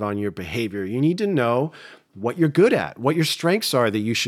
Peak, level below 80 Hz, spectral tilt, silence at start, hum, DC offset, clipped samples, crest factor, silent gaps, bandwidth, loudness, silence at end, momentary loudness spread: -6 dBFS; -64 dBFS; -5.5 dB/octave; 0 s; none; under 0.1%; under 0.1%; 16 dB; none; 17 kHz; -21 LUFS; 0 s; 9 LU